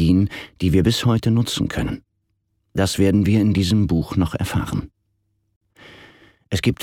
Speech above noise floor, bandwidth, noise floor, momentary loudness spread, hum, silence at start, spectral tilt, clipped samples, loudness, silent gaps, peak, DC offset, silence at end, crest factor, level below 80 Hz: 52 dB; 16.5 kHz; -70 dBFS; 10 LU; none; 0 s; -6 dB/octave; under 0.1%; -20 LUFS; 5.56-5.61 s; -4 dBFS; under 0.1%; 0 s; 16 dB; -38 dBFS